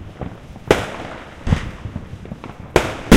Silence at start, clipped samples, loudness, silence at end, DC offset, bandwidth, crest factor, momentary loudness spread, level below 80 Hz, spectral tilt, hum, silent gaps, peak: 0 s; under 0.1%; -23 LUFS; 0 s; under 0.1%; 16 kHz; 20 dB; 15 LU; -30 dBFS; -5.5 dB/octave; none; none; 0 dBFS